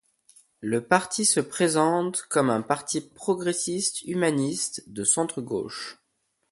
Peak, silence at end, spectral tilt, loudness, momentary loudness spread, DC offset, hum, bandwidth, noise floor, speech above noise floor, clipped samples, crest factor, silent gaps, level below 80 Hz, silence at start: -4 dBFS; 0.6 s; -3.5 dB/octave; -25 LUFS; 9 LU; under 0.1%; none; 12 kHz; -75 dBFS; 49 dB; under 0.1%; 24 dB; none; -68 dBFS; 0.6 s